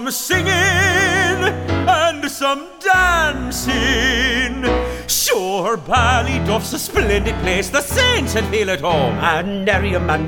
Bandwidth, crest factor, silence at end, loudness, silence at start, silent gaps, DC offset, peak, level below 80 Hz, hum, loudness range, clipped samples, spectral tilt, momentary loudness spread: 18.5 kHz; 16 dB; 0 s; -16 LUFS; 0 s; none; under 0.1%; 0 dBFS; -30 dBFS; none; 2 LU; under 0.1%; -3.5 dB/octave; 6 LU